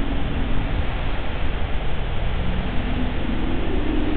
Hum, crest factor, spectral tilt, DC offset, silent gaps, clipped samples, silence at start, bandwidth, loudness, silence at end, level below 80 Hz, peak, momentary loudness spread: none; 12 dB; -10 dB/octave; under 0.1%; none; under 0.1%; 0 s; 4.3 kHz; -26 LUFS; 0 s; -24 dBFS; -8 dBFS; 3 LU